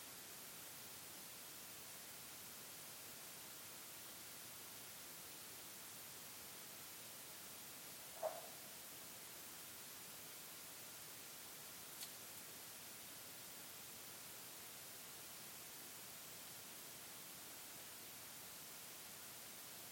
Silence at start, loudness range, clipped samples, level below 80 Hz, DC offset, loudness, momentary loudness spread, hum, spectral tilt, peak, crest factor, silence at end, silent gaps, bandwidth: 0 s; 1 LU; under 0.1%; -86 dBFS; under 0.1%; -52 LUFS; 0 LU; none; -1 dB/octave; -30 dBFS; 24 dB; 0 s; none; 17 kHz